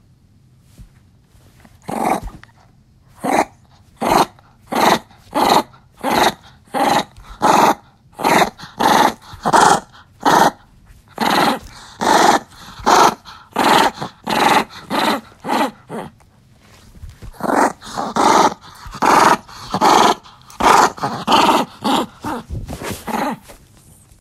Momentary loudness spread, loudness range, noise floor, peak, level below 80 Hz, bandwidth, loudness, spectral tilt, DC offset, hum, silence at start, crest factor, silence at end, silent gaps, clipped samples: 15 LU; 7 LU; -51 dBFS; 0 dBFS; -44 dBFS; 16 kHz; -16 LUFS; -3 dB/octave; under 0.1%; none; 0.8 s; 18 dB; 0.7 s; none; under 0.1%